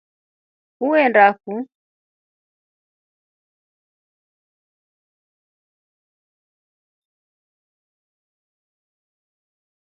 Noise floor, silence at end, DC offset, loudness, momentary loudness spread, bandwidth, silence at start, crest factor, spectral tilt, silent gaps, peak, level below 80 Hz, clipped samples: under -90 dBFS; 8.3 s; under 0.1%; -16 LUFS; 17 LU; 5.4 kHz; 0.8 s; 26 dB; -8.5 dB/octave; none; 0 dBFS; -80 dBFS; under 0.1%